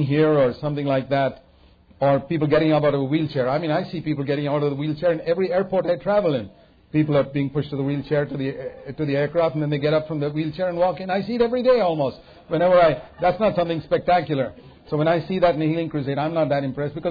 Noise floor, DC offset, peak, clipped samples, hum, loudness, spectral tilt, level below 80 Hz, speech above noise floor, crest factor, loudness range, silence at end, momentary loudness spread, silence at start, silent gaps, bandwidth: -52 dBFS; under 0.1%; -6 dBFS; under 0.1%; none; -22 LUFS; -9.5 dB/octave; -52 dBFS; 31 dB; 16 dB; 3 LU; 0 s; 8 LU; 0 s; none; 5 kHz